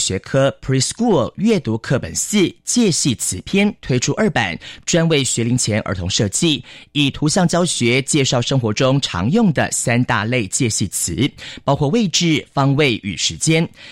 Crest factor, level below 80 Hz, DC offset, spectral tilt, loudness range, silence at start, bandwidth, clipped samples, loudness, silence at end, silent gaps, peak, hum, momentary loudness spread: 14 dB; -44 dBFS; under 0.1%; -4 dB/octave; 1 LU; 0 s; 16 kHz; under 0.1%; -17 LUFS; 0 s; none; -4 dBFS; none; 4 LU